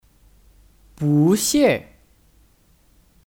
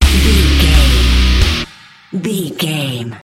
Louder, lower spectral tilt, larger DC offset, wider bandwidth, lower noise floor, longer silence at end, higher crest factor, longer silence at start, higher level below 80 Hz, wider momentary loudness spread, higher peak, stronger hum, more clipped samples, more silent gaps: second, -18 LUFS vs -13 LUFS; about the same, -5 dB/octave vs -4.5 dB/octave; neither; first, 18 kHz vs 16 kHz; first, -57 dBFS vs -38 dBFS; first, 1.45 s vs 0.05 s; about the same, 16 dB vs 12 dB; first, 1 s vs 0 s; second, -52 dBFS vs -14 dBFS; about the same, 10 LU vs 11 LU; second, -6 dBFS vs 0 dBFS; neither; neither; neither